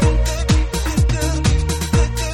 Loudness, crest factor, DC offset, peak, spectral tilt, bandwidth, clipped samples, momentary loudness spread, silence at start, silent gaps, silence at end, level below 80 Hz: -18 LUFS; 14 dB; under 0.1%; -4 dBFS; -5 dB/octave; 17 kHz; under 0.1%; 2 LU; 0 s; none; 0 s; -18 dBFS